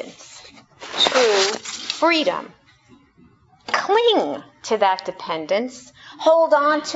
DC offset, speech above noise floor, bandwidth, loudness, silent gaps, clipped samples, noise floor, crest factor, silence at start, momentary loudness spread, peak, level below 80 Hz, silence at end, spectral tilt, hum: under 0.1%; 35 dB; 8 kHz; -19 LUFS; none; under 0.1%; -54 dBFS; 20 dB; 0 s; 19 LU; 0 dBFS; -66 dBFS; 0 s; -2 dB/octave; none